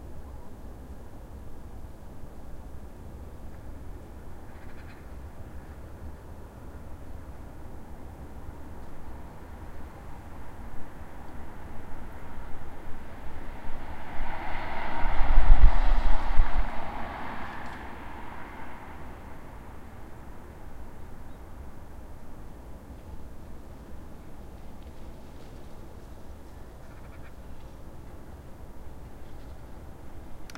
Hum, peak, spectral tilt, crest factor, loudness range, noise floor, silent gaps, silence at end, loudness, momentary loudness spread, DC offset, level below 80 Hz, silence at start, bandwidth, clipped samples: none; -2 dBFS; -6.5 dB/octave; 22 dB; 17 LU; -43 dBFS; none; 0.05 s; -39 LUFS; 15 LU; under 0.1%; -30 dBFS; 0.05 s; 4.4 kHz; under 0.1%